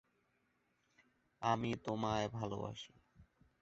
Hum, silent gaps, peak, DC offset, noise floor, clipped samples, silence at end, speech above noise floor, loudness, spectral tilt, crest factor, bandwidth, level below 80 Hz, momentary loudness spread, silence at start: none; none; -20 dBFS; under 0.1%; -80 dBFS; under 0.1%; 0.4 s; 40 dB; -40 LUFS; -5 dB/octave; 22 dB; 7.6 kHz; -68 dBFS; 12 LU; 1.4 s